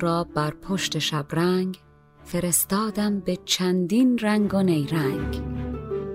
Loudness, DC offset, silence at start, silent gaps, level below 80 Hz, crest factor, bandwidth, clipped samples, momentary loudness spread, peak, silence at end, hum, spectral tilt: -24 LUFS; under 0.1%; 0 s; none; -44 dBFS; 18 dB; 16 kHz; under 0.1%; 10 LU; -6 dBFS; 0 s; none; -4.5 dB/octave